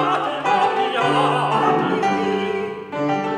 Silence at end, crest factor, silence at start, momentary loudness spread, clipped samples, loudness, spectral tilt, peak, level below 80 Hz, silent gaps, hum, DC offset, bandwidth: 0 s; 14 dB; 0 s; 6 LU; under 0.1%; -20 LUFS; -5.5 dB/octave; -6 dBFS; -64 dBFS; none; none; under 0.1%; 11.5 kHz